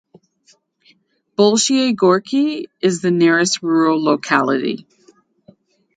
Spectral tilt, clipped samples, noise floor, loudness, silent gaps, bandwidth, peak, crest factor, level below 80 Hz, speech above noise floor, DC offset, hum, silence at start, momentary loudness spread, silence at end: -4 dB/octave; under 0.1%; -57 dBFS; -16 LUFS; none; 9.6 kHz; 0 dBFS; 18 dB; -66 dBFS; 42 dB; under 0.1%; none; 1.4 s; 7 LU; 1.2 s